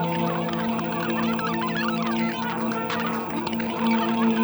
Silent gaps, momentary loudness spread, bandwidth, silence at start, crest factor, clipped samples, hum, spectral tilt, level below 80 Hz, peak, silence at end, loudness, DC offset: none; 4 LU; over 20 kHz; 0 s; 14 dB; under 0.1%; none; -6 dB/octave; -62 dBFS; -10 dBFS; 0 s; -25 LUFS; under 0.1%